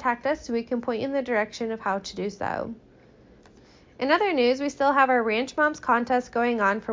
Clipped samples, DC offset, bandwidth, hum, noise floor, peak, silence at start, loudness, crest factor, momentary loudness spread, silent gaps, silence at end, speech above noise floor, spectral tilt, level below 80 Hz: under 0.1%; under 0.1%; 7.6 kHz; none; -53 dBFS; -6 dBFS; 0 s; -25 LUFS; 18 dB; 10 LU; none; 0 s; 29 dB; -4.5 dB/octave; -58 dBFS